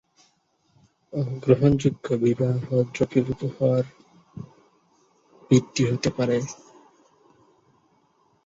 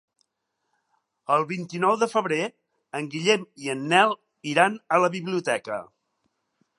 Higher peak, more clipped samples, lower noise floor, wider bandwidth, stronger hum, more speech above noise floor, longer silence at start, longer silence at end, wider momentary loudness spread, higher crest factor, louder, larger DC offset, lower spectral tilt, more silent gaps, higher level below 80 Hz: about the same, -4 dBFS vs -2 dBFS; neither; second, -67 dBFS vs -79 dBFS; second, 7.8 kHz vs 11.5 kHz; neither; second, 44 dB vs 55 dB; second, 1.15 s vs 1.3 s; first, 1.9 s vs 0.95 s; first, 23 LU vs 13 LU; about the same, 22 dB vs 24 dB; about the same, -23 LUFS vs -24 LUFS; neither; first, -7 dB/octave vs -4.5 dB/octave; neither; first, -54 dBFS vs -80 dBFS